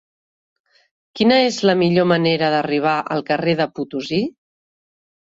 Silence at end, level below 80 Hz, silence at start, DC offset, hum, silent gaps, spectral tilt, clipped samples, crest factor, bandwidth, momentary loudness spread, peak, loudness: 0.9 s; -60 dBFS; 1.15 s; under 0.1%; none; none; -5.5 dB/octave; under 0.1%; 18 dB; 8 kHz; 8 LU; -2 dBFS; -18 LUFS